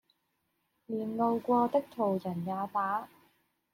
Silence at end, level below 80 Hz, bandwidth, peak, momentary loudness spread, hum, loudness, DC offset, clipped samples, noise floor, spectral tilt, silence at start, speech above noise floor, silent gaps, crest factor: 0.65 s; -76 dBFS; 16 kHz; -16 dBFS; 9 LU; none; -32 LUFS; under 0.1%; under 0.1%; -79 dBFS; -8.5 dB/octave; 0.9 s; 48 dB; none; 18 dB